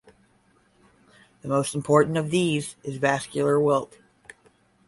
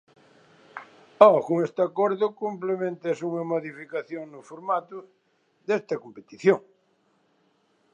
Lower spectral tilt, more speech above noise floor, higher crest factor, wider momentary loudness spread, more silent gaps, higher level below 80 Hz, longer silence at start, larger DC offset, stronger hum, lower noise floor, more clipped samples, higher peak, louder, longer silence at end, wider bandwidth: second, -5.5 dB/octave vs -7 dB/octave; second, 39 dB vs 43 dB; second, 20 dB vs 26 dB; second, 10 LU vs 25 LU; neither; first, -64 dBFS vs -80 dBFS; first, 1.45 s vs 0.75 s; neither; neither; second, -62 dBFS vs -67 dBFS; neither; second, -6 dBFS vs 0 dBFS; about the same, -24 LUFS vs -25 LUFS; second, 1 s vs 1.35 s; first, 11.5 kHz vs 9 kHz